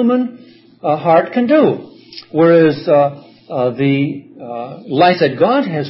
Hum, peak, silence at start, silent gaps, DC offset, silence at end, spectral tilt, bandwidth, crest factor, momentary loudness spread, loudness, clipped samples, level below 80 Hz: none; 0 dBFS; 0 s; none; under 0.1%; 0 s; -11.5 dB/octave; 5.8 kHz; 14 dB; 16 LU; -14 LUFS; under 0.1%; -64 dBFS